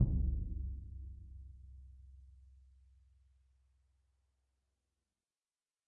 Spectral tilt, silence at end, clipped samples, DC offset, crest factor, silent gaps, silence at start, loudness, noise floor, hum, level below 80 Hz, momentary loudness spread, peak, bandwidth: -16.5 dB/octave; 3.4 s; under 0.1%; under 0.1%; 24 dB; none; 0 s; -42 LUFS; under -90 dBFS; none; -46 dBFS; 24 LU; -18 dBFS; 1.1 kHz